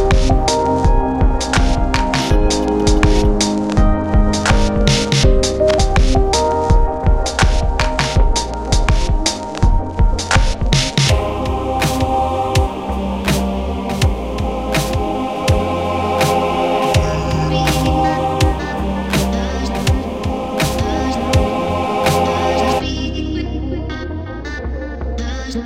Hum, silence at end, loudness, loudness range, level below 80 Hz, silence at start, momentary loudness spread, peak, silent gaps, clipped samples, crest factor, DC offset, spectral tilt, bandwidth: none; 0 s; -17 LUFS; 4 LU; -18 dBFS; 0 s; 7 LU; 0 dBFS; none; under 0.1%; 14 dB; 0.3%; -5 dB/octave; 16 kHz